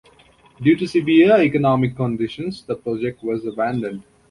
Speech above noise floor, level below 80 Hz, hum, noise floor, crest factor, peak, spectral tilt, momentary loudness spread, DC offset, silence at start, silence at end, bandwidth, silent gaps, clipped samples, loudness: 34 dB; -54 dBFS; none; -52 dBFS; 16 dB; -2 dBFS; -8 dB/octave; 13 LU; under 0.1%; 0.6 s; 0.3 s; 11 kHz; none; under 0.1%; -19 LUFS